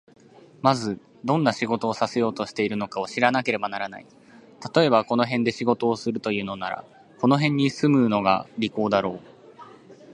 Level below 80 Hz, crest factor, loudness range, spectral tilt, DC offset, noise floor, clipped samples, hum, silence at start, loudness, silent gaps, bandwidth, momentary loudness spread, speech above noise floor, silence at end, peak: -64 dBFS; 22 dB; 2 LU; -6 dB/octave; under 0.1%; -47 dBFS; under 0.1%; none; 0.65 s; -24 LUFS; none; 11 kHz; 12 LU; 24 dB; 0 s; -2 dBFS